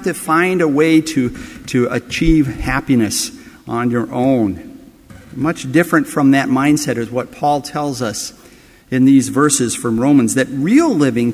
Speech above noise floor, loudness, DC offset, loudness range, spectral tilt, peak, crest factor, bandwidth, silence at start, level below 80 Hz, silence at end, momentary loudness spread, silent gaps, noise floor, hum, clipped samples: 29 dB; -15 LUFS; under 0.1%; 3 LU; -5 dB/octave; 0 dBFS; 14 dB; 16 kHz; 0 s; -36 dBFS; 0 s; 10 LU; none; -44 dBFS; none; under 0.1%